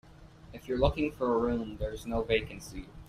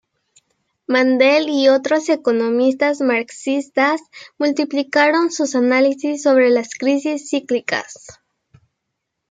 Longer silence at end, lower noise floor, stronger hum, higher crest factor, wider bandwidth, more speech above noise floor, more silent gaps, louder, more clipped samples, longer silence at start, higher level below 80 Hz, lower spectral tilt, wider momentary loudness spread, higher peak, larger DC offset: second, 0 s vs 1.2 s; second, -52 dBFS vs -77 dBFS; neither; about the same, 20 dB vs 16 dB; first, 15 kHz vs 9.4 kHz; second, 21 dB vs 60 dB; neither; second, -31 LUFS vs -17 LUFS; neither; second, 0.05 s vs 0.9 s; first, -44 dBFS vs -70 dBFS; first, -6 dB/octave vs -3 dB/octave; first, 15 LU vs 8 LU; second, -12 dBFS vs -2 dBFS; neither